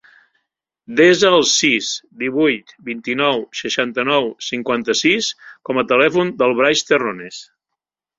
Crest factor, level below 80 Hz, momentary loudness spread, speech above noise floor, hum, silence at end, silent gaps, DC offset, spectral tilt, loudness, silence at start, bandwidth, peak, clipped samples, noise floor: 18 dB; -60 dBFS; 12 LU; 65 dB; none; 0.75 s; none; under 0.1%; -3 dB/octave; -16 LUFS; 0.9 s; 7.8 kHz; 0 dBFS; under 0.1%; -82 dBFS